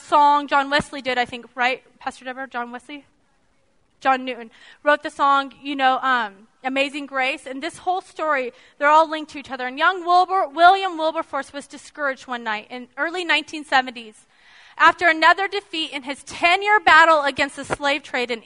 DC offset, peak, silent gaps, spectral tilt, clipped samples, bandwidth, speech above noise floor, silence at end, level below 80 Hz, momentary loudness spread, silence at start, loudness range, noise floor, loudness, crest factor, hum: under 0.1%; 0 dBFS; none; -2.5 dB/octave; under 0.1%; 11 kHz; 44 dB; 0.05 s; -60 dBFS; 16 LU; 0.05 s; 9 LU; -65 dBFS; -20 LUFS; 20 dB; none